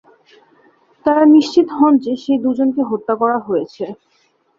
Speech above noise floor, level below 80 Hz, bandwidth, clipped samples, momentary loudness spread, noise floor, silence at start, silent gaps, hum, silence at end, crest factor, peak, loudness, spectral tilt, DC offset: 45 dB; -62 dBFS; 7.4 kHz; under 0.1%; 11 LU; -60 dBFS; 1.05 s; none; none; 0.65 s; 14 dB; -2 dBFS; -15 LUFS; -6 dB/octave; under 0.1%